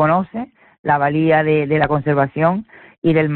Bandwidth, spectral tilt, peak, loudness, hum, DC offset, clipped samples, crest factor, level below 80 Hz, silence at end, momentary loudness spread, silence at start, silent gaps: 4.4 kHz; -10.5 dB/octave; -4 dBFS; -17 LUFS; none; under 0.1%; under 0.1%; 12 dB; -50 dBFS; 0 s; 12 LU; 0 s; 0.79-0.84 s, 2.98-3.02 s